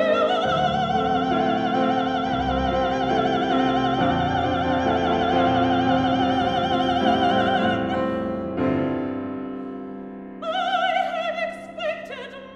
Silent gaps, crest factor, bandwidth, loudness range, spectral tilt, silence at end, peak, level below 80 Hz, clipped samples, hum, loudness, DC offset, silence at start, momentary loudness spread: none; 16 dB; 8.2 kHz; 6 LU; -6.5 dB/octave; 0 s; -6 dBFS; -44 dBFS; under 0.1%; none; -22 LUFS; under 0.1%; 0 s; 11 LU